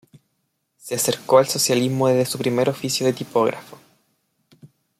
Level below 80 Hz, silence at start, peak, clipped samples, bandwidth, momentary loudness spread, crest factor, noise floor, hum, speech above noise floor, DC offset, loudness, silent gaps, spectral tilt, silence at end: -66 dBFS; 0.85 s; -4 dBFS; under 0.1%; 16 kHz; 7 LU; 18 dB; -73 dBFS; none; 53 dB; under 0.1%; -20 LUFS; none; -4 dB/octave; 0.35 s